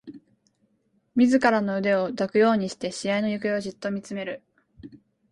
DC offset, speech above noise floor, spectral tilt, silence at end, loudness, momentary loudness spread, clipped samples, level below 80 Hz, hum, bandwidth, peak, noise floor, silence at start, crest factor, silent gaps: under 0.1%; 45 dB; -5.5 dB/octave; 0.35 s; -24 LUFS; 12 LU; under 0.1%; -66 dBFS; none; 11 kHz; -6 dBFS; -69 dBFS; 0.05 s; 20 dB; none